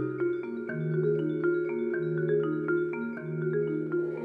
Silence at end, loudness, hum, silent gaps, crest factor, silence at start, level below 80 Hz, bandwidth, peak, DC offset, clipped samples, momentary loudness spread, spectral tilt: 0 s; -30 LUFS; none; none; 12 dB; 0 s; -72 dBFS; 4.1 kHz; -16 dBFS; under 0.1%; under 0.1%; 6 LU; -11 dB/octave